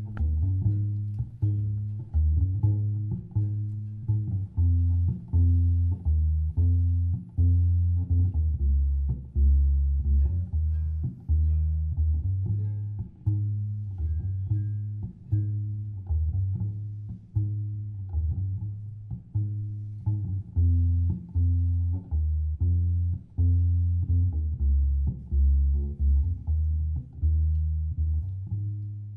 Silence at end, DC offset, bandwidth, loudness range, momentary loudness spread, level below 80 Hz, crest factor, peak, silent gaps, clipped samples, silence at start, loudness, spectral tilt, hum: 0 s; under 0.1%; 0.9 kHz; 6 LU; 9 LU; -30 dBFS; 12 dB; -12 dBFS; none; under 0.1%; 0 s; -28 LUFS; -13 dB/octave; none